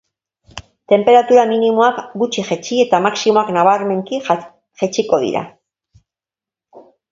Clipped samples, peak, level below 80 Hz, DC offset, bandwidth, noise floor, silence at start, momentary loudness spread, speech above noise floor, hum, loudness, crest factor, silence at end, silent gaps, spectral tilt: under 0.1%; 0 dBFS; -58 dBFS; under 0.1%; 7.8 kHz; -89 dBFS; 0.55 s; 13 LU; 75 dB; none; -15 LUFS; 16 dB; 0.3 s; none; -4.5 dB/octave